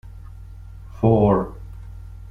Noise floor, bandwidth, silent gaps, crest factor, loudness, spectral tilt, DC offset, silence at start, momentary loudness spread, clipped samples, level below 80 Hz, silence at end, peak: -38 dBFS; 3.7 kHz; none; 18 dB; -19 LUFS; -11 dB/octave; under 0.1%; 0.05 s; 24 LU; under 0.1%; -38 dBFS; 0 s; -4 dBFS